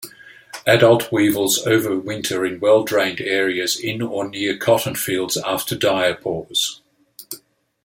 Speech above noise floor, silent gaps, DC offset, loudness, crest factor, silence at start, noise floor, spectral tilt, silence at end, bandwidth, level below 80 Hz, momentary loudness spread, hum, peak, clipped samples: 31 dB; none; under 0.1%; -19 LUFS; 18 dB; 0 s; -49 dBFS; -3.5 dB/octave; 0.45 s; 17 kHz; -60 dBFS; 10 LU; none; -2 dBFS; under 0.1%